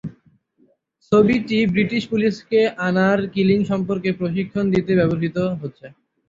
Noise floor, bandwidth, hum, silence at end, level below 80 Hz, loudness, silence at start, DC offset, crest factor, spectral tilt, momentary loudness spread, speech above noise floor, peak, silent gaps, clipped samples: -61 dBFS; 7.6 kHz; none; 0.4 s; -52 dBFS; -19 LUFS; 0.05 s; under 0.1%; 16 dB; -7.5 dB/octave; 6 LU; 42 dB; -4 dBFS; none; under 0.1%